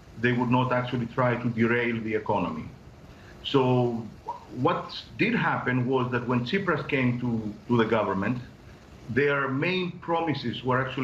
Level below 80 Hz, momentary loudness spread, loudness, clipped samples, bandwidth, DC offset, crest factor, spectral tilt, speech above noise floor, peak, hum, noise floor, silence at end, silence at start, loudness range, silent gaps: -56 dBFS; 11 LU; -26 LUFS; under 0.1%; 7.6 kHz; under 0.1%; 18 dB; -7.5 dB/octave; 22 dB; -8 dBFS; none; -48 dBFS; 0 s; 0 s; 2 LU; none